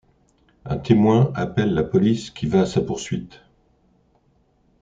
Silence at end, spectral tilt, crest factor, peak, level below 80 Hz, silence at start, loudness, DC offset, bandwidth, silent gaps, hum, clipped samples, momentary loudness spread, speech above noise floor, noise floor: 1.55 s; -7.5 dB/octave; 20 dB; -2 dBFS; -48 dBFS; 0.65 s; -21 LUFS; under 0.1%; 9 kHz; none; none; under 0.1%; 13 LU; 42 dB; -62 dBFS